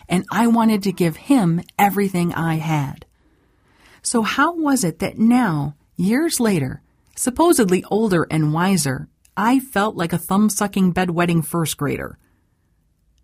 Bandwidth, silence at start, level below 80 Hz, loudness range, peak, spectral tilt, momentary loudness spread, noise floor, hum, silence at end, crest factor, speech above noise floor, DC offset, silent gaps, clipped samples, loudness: 16 kHz; 0.1 s; -50 dBFS; 2 LU; -2 dBFS; -5.5 dB/octave; 8 LU; -63 dBFS; none; 1.15 s; 16 dB; 45 dB; under 0.1%; none; under 0.1%; -19 LUFS